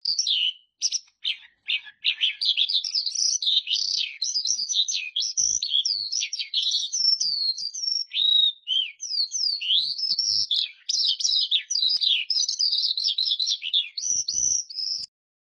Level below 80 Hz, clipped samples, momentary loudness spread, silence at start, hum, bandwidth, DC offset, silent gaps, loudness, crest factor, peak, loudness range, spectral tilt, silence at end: -70 dBFS; under 0.1%; 7 LU; 0.05 s; none; 10.5 kHz; under 0.1%; none; -22 LUFS; 18 dB; -8 dBFS; 2 LU; 5 dB/octave; 0.45 s